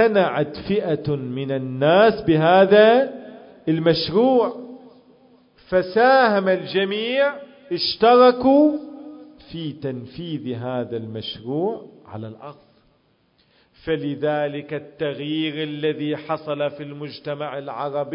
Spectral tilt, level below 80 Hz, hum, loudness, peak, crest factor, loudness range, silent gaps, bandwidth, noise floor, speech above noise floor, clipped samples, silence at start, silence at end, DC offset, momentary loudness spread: -10.5 dB/octave; -58 dBFS; none; -20 LUFS; -2 dBFS; 18 dB; 12 LU; none; 5.4 kHz; -62 dBFS; 43 dB; under 0.1%; 0 s; 0 s; under 0.1%; 19 LU